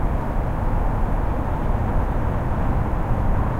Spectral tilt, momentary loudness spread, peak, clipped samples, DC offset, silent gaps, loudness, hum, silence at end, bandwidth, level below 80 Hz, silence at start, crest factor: -9 dB/octave; 2 LU; -8 dBFS; under 0.1%; under 0.1%; none; -24 LUFS; none; 0 s; 4.2 kHz; -22 dBFS; 0 s; 12 dB